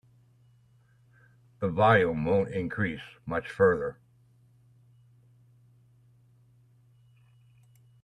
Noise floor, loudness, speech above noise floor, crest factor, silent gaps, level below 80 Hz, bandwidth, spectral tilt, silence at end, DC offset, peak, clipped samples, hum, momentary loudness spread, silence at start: -62 dBFS; -27 LUFS; 36 dB; 22 dB; none; -62 dBFS; 10 kHz; -8 dB/octave; 4.1 s; under 0.1%; -10 dBFS; under 0.1%; none; 13 LU; 1.6 s